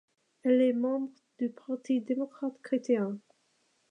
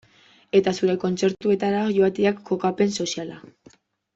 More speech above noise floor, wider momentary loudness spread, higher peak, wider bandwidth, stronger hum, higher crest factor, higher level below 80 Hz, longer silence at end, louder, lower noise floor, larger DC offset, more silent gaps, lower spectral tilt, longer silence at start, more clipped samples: first, 43 dB vs 34 dB; first, 13 LU vs 7 LU; second, -16 dBFS vs -6 dBFS; first, 9.2 kHz vs 8 kHz; neither; about the same, 16 dB vs 18 dB; second, -88 dBFS vs -62 dBFS; about the same, 0.7 s vs 0.7 s; second, -31 LUFS vs -22 LUFS; first, -72 dBFS vs -56 dBFS; neither; neither; first, -7 dB/octave vs -5.5 dB/octave; about the same, 0.45 s vs 0.55 s; neither